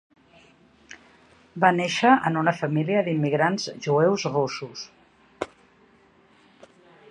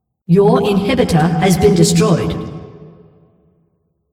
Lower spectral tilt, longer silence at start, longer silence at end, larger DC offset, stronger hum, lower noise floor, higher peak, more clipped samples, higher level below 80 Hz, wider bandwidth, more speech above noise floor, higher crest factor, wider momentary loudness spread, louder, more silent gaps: about the same, -5.5 dB/octave vs -6 dB/octave; first, 0.9 s vs 0.3 s; first, 1.65 s vs 1.25 s; neither; neither; second, -58 dBFS vs -63 dBFS; about the same, -2 dBFS vs 0 dBFS; neither; second, -68 dBFS vs -38 dBFS; second, 10.5 kHz vs 16 kHz; second, 35 dB vs 51 dB; first, 22 dB vs 14 dB; first, 17 LU vs 13 LU; second, -23 LUFS vs -13 LUFS; neither